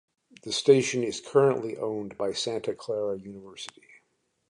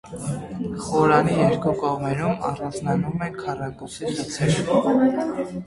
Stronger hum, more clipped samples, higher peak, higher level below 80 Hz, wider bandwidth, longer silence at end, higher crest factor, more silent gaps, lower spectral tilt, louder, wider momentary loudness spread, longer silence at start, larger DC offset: neither; neither; about the same, -6 dBFS vs -4 dBFS; second, -70 dBFS vs -50 dBFS; about the same, 11 kHz vs 11.5 kHz; first, 0.8 s vs 0 s; about the same, 22 dB vs 20 dB; neither; second, -4.5 dB/octave vs -6.5 dB/octave; second, -27 LUFS vs -23 LUFS; first, 20 LU vs 12 LU; first, 0.45 s vs 0.05 s; neither